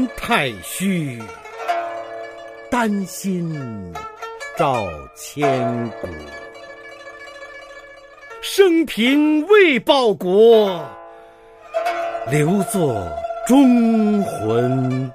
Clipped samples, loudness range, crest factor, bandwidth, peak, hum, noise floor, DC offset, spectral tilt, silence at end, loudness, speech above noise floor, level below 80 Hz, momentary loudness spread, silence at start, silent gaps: under 0.1%; 10 LU; 18 dB; 15.5 kHz; -2 dBFS; 50 Hz at -50 dBFS; -44 dBFS; under 0.1%; -5.5 dB/octave; 0 s; -18 LUFS; 27 dB; -50 dBFS; 23 LU; 0 s; none